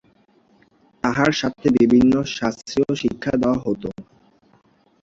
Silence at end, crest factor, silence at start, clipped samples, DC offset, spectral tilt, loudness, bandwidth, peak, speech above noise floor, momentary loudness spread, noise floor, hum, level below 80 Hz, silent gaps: 1 s; 20 dB; 1.05 s; under 0.1%; under 0.1%; -6 dB/octave; -20 LUFS; 7.6 kHz; -2 dBFS; 39 dB; 11 LU; -58 dBFS; none; -48 dBFS; none